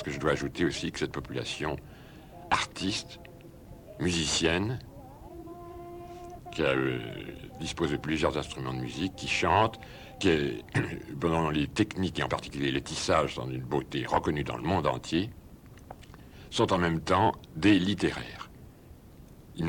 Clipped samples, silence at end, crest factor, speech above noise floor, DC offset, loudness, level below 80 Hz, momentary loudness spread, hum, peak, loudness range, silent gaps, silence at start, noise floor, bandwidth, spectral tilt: under 0.1%; 0 s; 20 dB; 22 dB; under 0.1%; -29 LUFS; -50 dBFS; 21 LU; none; -10 dBFS; 4 LU; none; 0 s; -51 dBFS; 18 kHz; -5 dB/octave